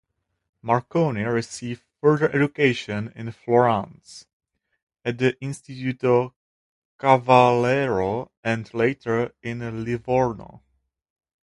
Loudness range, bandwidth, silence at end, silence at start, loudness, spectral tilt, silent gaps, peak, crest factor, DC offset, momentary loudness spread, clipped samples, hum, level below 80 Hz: 5 LU; 11.5 kHz; 0.9 s; 0.65 s; -22 LUFS; -6.5 dB/octave; 4.33-4.40 s, 4.82-4.87 s, 6.36-6.99 s, 8.37-8.43 s; 0 dBFS; 22 dB; under 0.1%; 14 LU; under 0.1%; none; -56 dBFS